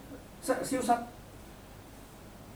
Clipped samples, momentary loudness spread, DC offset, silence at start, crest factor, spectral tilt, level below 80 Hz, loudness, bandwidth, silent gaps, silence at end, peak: under 0.1%; 21 LU; under 0.1%; 0 s; 22 dB; -4 dB/octave; -56 dBFS; -32 LUFS; over 20 kHz; none; 0 s; -14 dBFS